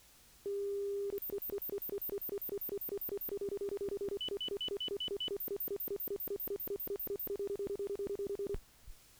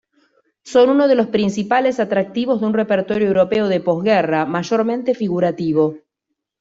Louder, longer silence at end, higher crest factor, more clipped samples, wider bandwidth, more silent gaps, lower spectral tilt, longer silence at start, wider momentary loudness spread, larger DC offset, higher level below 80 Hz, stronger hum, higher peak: second, -39 LUFS vs -17 LUFS; second, 0 s vs 0.65 s; about the same, 12 dB vs 14 dB; neither; first, over 20 kHz vs 7.8 kHz; neither; second, -4 dB/octave vs -6.5 dB/octave; second, 0 s vs 0.65 s; second, 2 LU vs 5 LU; neither; about the same, -60 dBFS vs -58 dBFS; neither; second, -28 dBFS vs -2 dBFS